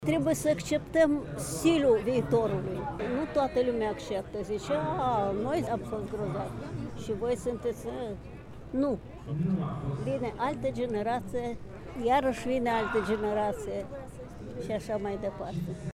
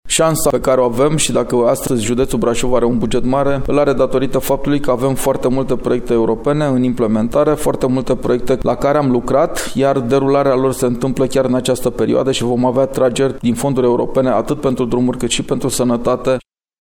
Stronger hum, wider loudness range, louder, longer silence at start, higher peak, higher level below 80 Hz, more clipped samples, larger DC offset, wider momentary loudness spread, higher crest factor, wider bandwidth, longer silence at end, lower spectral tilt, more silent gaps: neither; first, 6 LU vs 1 LU; second, -31 LUFS vs -15 LUFS; about the same, 0 s vs 0.05 s; second, -12 dBFS vs -2 dBFS; second, -50 dBFS vs -32 dBFS; neither; neither; first, 11 LU vs 3 LU; first, 18 dB vs 12 dB; second, 16 kHz vs 18 kHz; second, 0.05 s vs 0.4 s; about the same, -6 dB/octave vs -5.5 dB/octave; neither